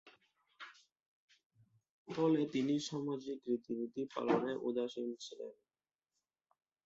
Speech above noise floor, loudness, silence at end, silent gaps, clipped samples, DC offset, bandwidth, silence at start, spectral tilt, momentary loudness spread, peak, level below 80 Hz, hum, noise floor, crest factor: over 53 dB; -38 LUFS; 1.35 s; 1.06-1.28 s, 1.46-1.50 s, 1.90-2.05 s; under 0.1%; under 0.1%; 8 kHz; 0.05 s; -5.5 dB/octave; 17 LU; -20 dBFS; -84 dBFS; none; under -90 dBFS; 20 dB